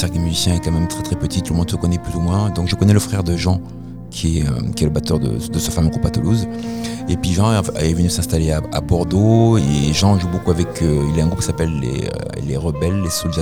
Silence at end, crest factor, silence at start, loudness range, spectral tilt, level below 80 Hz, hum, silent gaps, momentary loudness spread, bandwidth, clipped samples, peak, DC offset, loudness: 0 s; 16 dB; 0 s; 3 LU; -6 dB/octave; -30 dBFS; none; none; 8 LU; 16.5 kHz; under 0.1%; 0 dBFS; under 0.1%; -18 LUFS